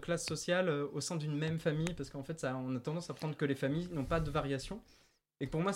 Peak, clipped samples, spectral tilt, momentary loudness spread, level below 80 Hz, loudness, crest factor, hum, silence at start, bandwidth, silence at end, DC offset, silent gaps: -20 dBFS; under 0.1%; -5.5 dB/octave; 8 LU; -54 dBFS; -37 LUFS; 16 dB; none; 0 s; 15.5 kHz; 0 s; under 0.1%; none